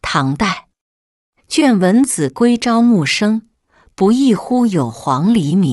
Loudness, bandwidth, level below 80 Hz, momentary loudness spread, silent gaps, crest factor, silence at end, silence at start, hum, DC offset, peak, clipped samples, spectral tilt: -14 LUFS; 12 kHz; -48 dBFS; 6 LU; 0.81-1.33 s; 12 dB; 0 s; 0.05 s; none; under 0.1%; -2 dBFS; under 0.1%; -5.5 dB/octave